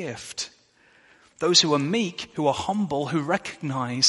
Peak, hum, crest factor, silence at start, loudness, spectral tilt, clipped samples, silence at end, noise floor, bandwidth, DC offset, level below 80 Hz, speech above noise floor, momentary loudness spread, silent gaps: -4 dBFS; none; 22 dB; 0 s; -24 LUFS; -3.5 dB/octave; under 0.1%; 0 s; -59 dBFS; 11.5 kHz; under 0.1%; -64 dBFS; 34 dB; 15 LU; none